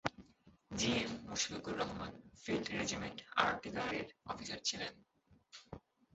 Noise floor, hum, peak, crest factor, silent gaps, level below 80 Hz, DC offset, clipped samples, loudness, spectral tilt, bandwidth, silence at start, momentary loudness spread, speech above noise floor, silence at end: -67 dBFS; none; -14 dBFS; 28 dB; none; -64 dBFS; under 0.1%; under 0.1%; -39 LUFS; -2.5 dB/octave; 8 kHz; 0.05 s; 18 LU; 26 dB; 0.35 s